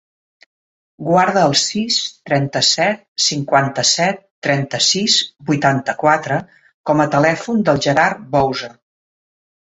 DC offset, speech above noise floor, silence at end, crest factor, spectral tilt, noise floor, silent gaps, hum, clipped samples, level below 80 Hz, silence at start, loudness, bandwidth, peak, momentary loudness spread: under 0.1%; over 74 dB; 1.05 s; 16 dB; -3.5 dB/octave; under -90 dBFS; 3.08-3.16 s, 4.31-4.42 s, 6.74-6.84 s; none; under 0.1%; -56 dBFS; 1 s; -16 LUFS; 8.4 kHz; 0 dBFS; 7 LU